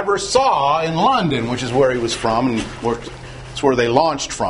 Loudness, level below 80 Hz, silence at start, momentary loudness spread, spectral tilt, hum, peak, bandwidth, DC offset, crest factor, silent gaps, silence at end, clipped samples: -17 LUFS; -42 dBFS; 0 s; 8 LU; -4.5 dB/octave; none; 0 dBFS; 11 kHz; under 0.1%; 18 dB; none; 0 s; under 0.1%